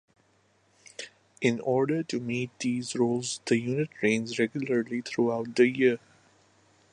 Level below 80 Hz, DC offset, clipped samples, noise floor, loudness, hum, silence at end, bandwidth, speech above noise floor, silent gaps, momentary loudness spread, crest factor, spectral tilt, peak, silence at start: -72 dBFS; under 0.1%; under 0.1%; -66 dBFS; -28 LUFS; none; 0.95 s; 11 kHz; 39 dB; none; 11 LU; 20 dB; -5 dB/octave; -8 dBFS; 1 s